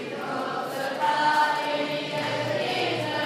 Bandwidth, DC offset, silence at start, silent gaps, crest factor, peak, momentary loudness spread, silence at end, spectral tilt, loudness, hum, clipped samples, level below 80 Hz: 15.5 kHz; under 0.1%; 0 s; none; 16 dB; -12 dBFS; 8 LU; 0 s; -4 dB/octave; -26 LUFS; none; under 0.1%; -74 dBFS